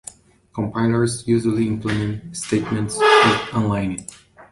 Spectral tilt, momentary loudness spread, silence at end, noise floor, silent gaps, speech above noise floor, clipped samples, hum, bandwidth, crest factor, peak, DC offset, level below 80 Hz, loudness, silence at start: -5 dB/octave; 15 LU; 0.05 s; -43 dBFS; none; 24 dB; under 0.1%; none; 11.5 kHz; 18 dB; -2 dBFS; under 0.1%; -48 dBFS; -19 LUFS; 0.55 s